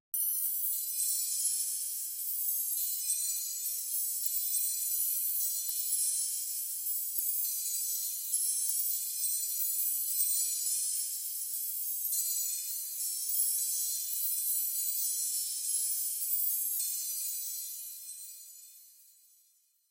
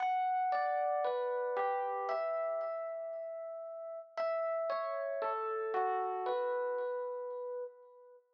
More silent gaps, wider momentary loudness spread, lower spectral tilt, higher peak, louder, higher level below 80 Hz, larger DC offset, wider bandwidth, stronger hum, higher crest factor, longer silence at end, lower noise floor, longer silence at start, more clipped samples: neither; second, 5 LU vs 10 LU; second, 11 dB/octave vs 1 dB/octave; first, -12 dBFS vs -22 dBFS; first, -30 LUFS vs -36 LUFS; about the same, under -90 dBFS vs under -90 dBFS; neither; first, 16 kHz vs 6.2 kHz; neither; first, 22 dB vs 14 dB; first, 0.9 s vs 0.15 s; first, -69 dBFS vs -59 dBFS; first, 0.15 s vs 0 s; neither